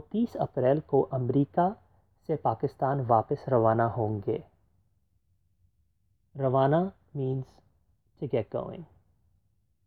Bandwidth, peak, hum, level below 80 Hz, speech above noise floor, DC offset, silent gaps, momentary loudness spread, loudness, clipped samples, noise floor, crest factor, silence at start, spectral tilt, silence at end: 4.8 kHz; -10 dBFS; none; -62 dBFS; 45 dB; under 0.1%; none; 13 LU; -28 LUFS; under 0.1%; -73 dBFS; 20 dB; 0.15 s; -10.5 dB/octave; 1 s